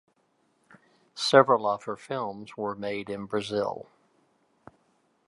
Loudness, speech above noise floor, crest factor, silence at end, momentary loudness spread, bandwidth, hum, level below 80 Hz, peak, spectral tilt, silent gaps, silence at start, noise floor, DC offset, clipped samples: -27 LUFS; 43 dB; 26 dB; 1.45 s; 15 LU; 11.5 kHz; none; -72 dBFS; -2 dBFS; -4.5 dB/octave; none; 1.15 s; -70 dBFS; under 0.1%; under 0.1%